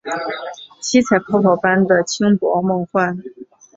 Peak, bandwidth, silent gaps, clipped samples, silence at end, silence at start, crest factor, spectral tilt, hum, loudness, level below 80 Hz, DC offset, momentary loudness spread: -2 dBFS; 7.8 kHz; none; under 0.1%; 0.35 s; 0.05 s; 16 dB; -5 dB/octave; none; -17 LUFS; -58 dBFS; under 0.1%; 13 LU